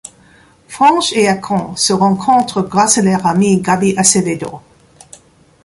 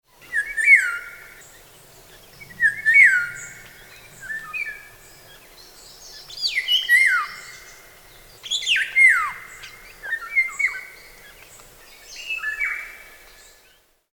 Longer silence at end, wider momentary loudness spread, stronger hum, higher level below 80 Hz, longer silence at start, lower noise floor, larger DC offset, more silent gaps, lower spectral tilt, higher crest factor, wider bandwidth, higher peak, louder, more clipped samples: about the same, 1.05 s vs 1.1 s; second, 8 LU vs 26 LU; neither; first, -50 dBFS vs -58 dBFS; first, 0.7 s vs 0.3 s; second, -47 dBFS vs -58 dBFS; neither; neither; first, -4 dB/octave vs 1.5 dB/octave; second, 14 dB vs 20 dB; second, 12 kHz vs over 20 kHz; first, 0 dBFS vs -4 dBFS; first, -13 LUFS vs -18 LUFS; neither